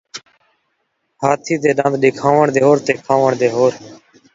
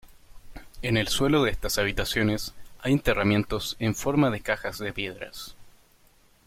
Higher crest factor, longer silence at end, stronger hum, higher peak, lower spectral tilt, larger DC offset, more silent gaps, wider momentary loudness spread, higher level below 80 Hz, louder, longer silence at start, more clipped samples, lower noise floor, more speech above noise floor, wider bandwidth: about the same, 16 dB vs 18 dB; second, 0.4 s vs 0.75 s; neither; first, 0 dBFS vs -8 dBFS; about the same, -6 dB/octave vs -5 dB/octave; neither; neither; second, 8 LU vs 12 LU; second, -60 dBFS vs -42 dBFS; first, -15 LUFS vs -26 LUFS; second, 0.15 s vs 0.3 s; neither; first, -69 dBFS vs -59 dBFS; first, 54 dB vs 34 dB; second, 7.8 kHz vs 16.5 kHz